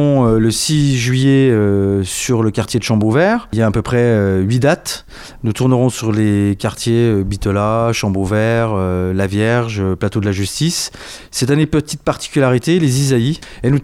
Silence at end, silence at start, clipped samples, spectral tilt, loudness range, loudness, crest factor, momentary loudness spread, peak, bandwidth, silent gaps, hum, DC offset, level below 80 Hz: 0 s; 0 s; under 0.1%; -6 dB/octave; 3 LU; -15 LUFS; 12 dB; 7 LU; -2 dBFS; 16 kHz; none; none; under 0.1%; -36 dBFS